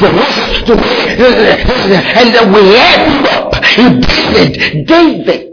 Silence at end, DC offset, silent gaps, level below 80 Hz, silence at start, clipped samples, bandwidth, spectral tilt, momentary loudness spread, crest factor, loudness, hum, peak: 0 s; under 0.1%; none; -24 dBFS; 0 s; 4%; 5.4 kHz; -5.5 dB/octave; 6 LU; 6 dB; -6 LUFS; none; 0 dBFS